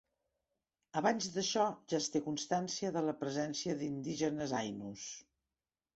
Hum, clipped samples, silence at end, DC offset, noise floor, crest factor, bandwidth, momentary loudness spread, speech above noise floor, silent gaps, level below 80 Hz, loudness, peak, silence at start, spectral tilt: none; under 0.1%; 0.75 s; under 0.1%; under -90 dBFS; 20 dB; 8 kHz; 10 LU; over 53 dB; none; -74 dBFS; -37 LUFS; -18 dBFS; 0.95 s; -4 dB/octave